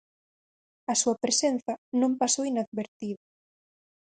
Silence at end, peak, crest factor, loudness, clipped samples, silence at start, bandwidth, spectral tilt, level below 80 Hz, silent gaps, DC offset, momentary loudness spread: 0.9 s; -12 dBFS; 18 dB; -27 LUFS; under 0.1%; 0.9 s; 9.6 kHz; -2.5 dB/octave; -76 dBFS; 1.78-1.92 s, 2.67-2.72 s, 2.88-3.00 s; under 0.1%; 13 LU